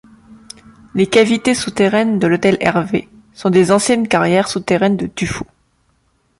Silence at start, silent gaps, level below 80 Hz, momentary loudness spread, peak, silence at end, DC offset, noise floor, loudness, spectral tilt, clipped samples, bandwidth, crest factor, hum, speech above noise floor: 0.3 s; none; -48 dBFS; 10 LU; 0 dBFS; 0.95 s; under 0.1%; -60 dBFS; -15 LUFS; -5 dB/octave; under 0.1%; 11.5 kHz; 16 dB; none; 46 dB